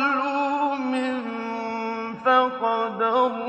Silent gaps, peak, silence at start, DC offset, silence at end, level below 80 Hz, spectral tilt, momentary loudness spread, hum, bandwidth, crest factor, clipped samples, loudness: none; -6 dBFS; 0 s; under 0.1%; 0 s; -74 dBFS; -5 dB/octave; 9 LU; none; 8.8 kHz; 18 dB; under 0.1%; -24 LUFS